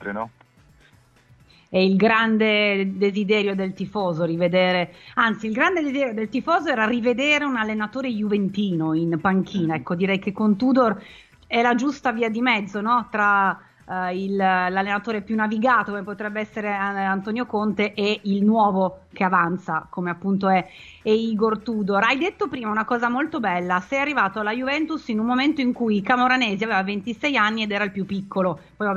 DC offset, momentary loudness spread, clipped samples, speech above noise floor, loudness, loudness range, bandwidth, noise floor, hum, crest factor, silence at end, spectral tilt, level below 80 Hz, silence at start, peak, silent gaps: under 0.1%; 8 LU; under 0.1%; 33 dB; -22 LUFS; 2 LU; 7.4 kHz; -55 dBFS; none; 18 dB; 0 s; -6.5 dB/octave; -60 dBFS; 0 s; -4 dBFS; none